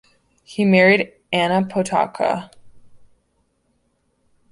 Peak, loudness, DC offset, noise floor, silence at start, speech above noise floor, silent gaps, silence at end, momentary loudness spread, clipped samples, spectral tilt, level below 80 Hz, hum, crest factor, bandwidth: -2 dBFS; -18 LUFS; under 0.1%; -66 dBFS; 0.5 s; 49 dB; none; 1.55 s; 9 LU; under 0.1%; -6 dB/octave; -60 dBFS; none; 20 dB; 11.5 kHz